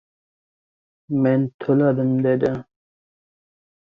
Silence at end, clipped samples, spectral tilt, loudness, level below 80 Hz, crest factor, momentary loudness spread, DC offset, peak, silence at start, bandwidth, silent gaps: 1.3 s; under 0.1%; -10.5 dB/octave; -20 LUFS; -60 dBFS; 18 dB; 7 LU; under 0.1%; -6 dBFS; 1.1 s; 5 kHz; 1.54-1.59 s